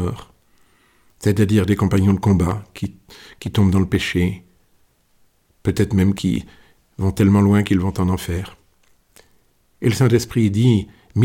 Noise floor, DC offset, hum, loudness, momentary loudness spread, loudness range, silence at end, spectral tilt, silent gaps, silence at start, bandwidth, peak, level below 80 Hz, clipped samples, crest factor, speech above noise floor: -59 dBFS; under 0.1%; none; -18 LUFS; 12 LU; 4 LU; 0 s; -7 dB/octave; none; 0 s; 16.5 kHz; -4 dBFS; -42 dBFS; under 0.1%; 14 dB; 42 dB